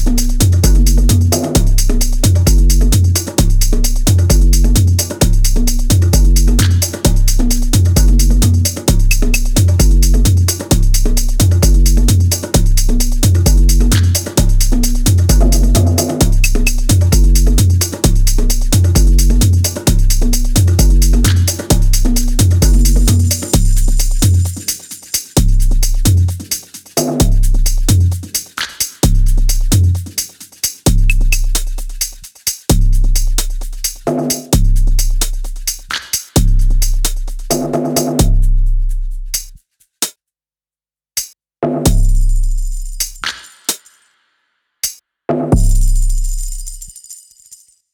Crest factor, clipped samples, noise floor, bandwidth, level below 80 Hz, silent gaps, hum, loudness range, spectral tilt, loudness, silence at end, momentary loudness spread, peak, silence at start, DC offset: 10 dB; under 0.1%; under -90 dBFS; 19.5 kHz; -12 dBFS; none; none; 7 LU; -4.5 dB/octave; -14 LUFS; 0.8 s; 10 LU; 0 dBFS; 0 s; under 0.1%